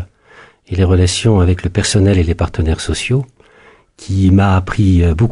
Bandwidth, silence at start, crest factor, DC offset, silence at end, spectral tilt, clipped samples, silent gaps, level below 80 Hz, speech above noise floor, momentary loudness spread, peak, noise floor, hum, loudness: 11 kHz; 0 s; 12 dB; under 0.1%; 0 s; -6 dB/octave; under 0.1%; none; -26 dBFS; 34 dB; 7 LU; -2 dBFS; -46 dBFS; none; -14 LUFS